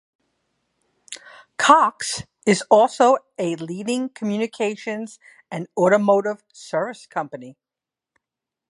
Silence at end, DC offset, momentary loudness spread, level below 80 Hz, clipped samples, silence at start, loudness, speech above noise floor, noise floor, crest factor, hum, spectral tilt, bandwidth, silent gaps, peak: 1.2 s; under 0.1%; 21 LU; -66 dBFS; under 0.1%; 1.1 s; -20 LUFS; 68 dB; -88 dBFS; 22 dB; none; -4.5 dB/octave; 11.5 kHz; none; 0 dBFS